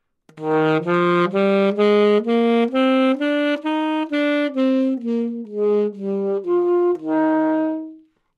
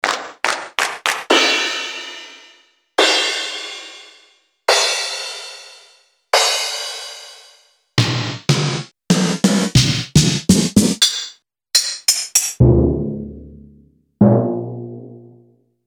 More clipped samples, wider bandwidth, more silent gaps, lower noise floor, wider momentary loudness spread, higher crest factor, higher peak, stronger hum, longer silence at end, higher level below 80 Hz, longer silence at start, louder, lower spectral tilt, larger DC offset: neither; second, 9.8 kHz vs over 20 kHz; neither; second, -44 dBFS vs -54 dBFS; second, 7 LU vs 18 LU; about the same, 14 dB vs 18 dB; second, -4 dBFS vs 0 dBFS; neither; second, 0.4 s vs 0.65 s; second, -78 dBFS vs -36 dBFS; first, 0.35 s vs 0.05 s; second, -19 LUFS vs -16 LUFS; first, -7.5 dB/octave vs -3.5 dB/octave; neither